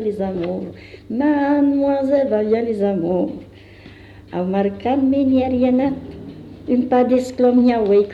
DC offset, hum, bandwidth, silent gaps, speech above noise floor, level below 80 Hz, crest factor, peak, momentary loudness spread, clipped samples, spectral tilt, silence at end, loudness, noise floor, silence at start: under 0.1%; none; 8 kHz; none; 24 dB; -50 dBFS; 12 dB; -6 dBFS; 14 LU; under 0.1%; -8 dB/octave; 0 s; -18 LUFS; -41 dBFS; 0 s